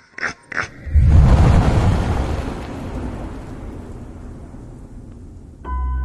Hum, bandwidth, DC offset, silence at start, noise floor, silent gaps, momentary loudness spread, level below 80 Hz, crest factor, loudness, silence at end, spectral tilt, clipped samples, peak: none; 11 kHz; under 0.1%; 0.2 s; -37 dBFS; none; 25 LU; -22 dBFS; 16 dB; -18 LUFS; 0 s; -7.5 dB/octave; under 0.1%; -2 dBFS